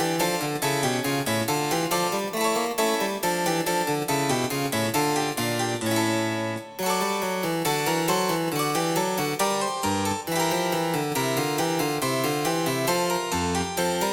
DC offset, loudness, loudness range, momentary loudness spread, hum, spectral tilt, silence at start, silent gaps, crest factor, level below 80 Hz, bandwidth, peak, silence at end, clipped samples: under 0.1%; -25 LUFS; 1 LU; 2 LU; none; -3.5 dB/octave; 0 s; none; 16 dB; -58 dBFS; 19.5 kHz; -10 dBFS; 0 s; under 0.1%